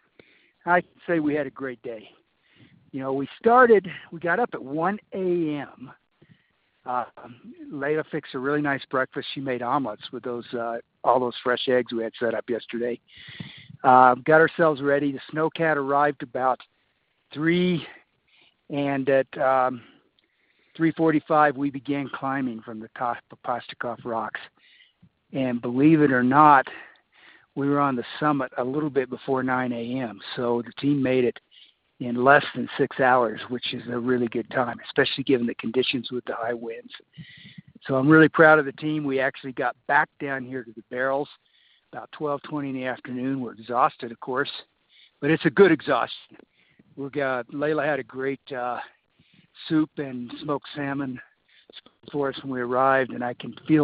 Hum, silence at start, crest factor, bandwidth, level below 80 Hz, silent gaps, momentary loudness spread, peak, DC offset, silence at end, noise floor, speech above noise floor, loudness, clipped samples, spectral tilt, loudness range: none; 0.65 s; 24 dB; 5 kHz; -68 dBFS; none; 17 LU; 0 dBFS; under 0.1%; 0 s; -70 dBFS; 47 dB; -24 LUFS; under 0.1%; -4 dB/octave; 9 LU